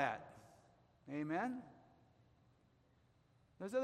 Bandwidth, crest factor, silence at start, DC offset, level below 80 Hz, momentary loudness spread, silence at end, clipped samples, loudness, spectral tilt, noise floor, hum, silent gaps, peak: 13.5 kHz; 24 dB; 0 s; under 0.1%; -82 dBFS; 23 LU; 0 s; under 0.1%; -44 LUFS; -6.5 dB/octave; -73 dBFS; none; none; -22 dBFS